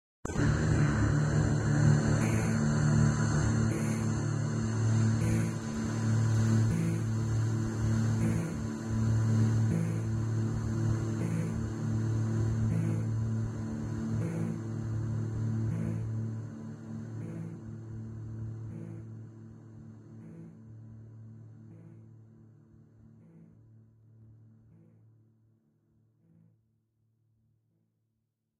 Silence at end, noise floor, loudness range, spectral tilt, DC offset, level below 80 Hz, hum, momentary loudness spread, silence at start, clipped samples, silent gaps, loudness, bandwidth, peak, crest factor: 4.25 s; -82 dBFS; 19 LU; -7 dB/octave; under 0.1%; -48 dBFS; none; 22 LU; 0.25 s; under 0.1%; none; -31 LUFS; 11.5 kHz; -12 dBFS; 18 dB